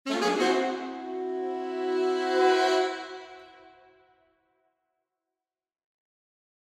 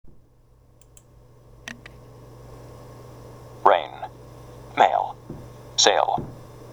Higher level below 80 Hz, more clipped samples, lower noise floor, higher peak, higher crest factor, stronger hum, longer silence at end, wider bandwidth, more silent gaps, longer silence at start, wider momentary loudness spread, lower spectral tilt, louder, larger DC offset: second, -80 dBFS vs -54 dBFS; neither; first, -90 dBFS vs -55 dBFS; second, -12 dBFS vs 0 dBFS; second, 18 dB vs 26 dB; neither; first, 2.95 s vs 0 s; second, 12.5 kHz vs over 20 kHz; neither; about the same, 0.05 s vs 0.05 s; second, 15 LU vs 26 LU; about the same, -3 dB/octave vs -2 dB/octave; second, -27 LUFS vs -21 LUFS; neither